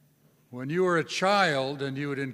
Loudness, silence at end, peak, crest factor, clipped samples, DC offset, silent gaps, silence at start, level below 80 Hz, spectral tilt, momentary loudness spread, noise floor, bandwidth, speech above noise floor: -26 LUFS; 0 s; -8 dBFS; 20 dB; under 0.1%; under 0.1%; none; 0.5 s; -74 dBFS; -5 dB/octave; 11 LU; -63 dBFS; 14.5 kHz; 36 dB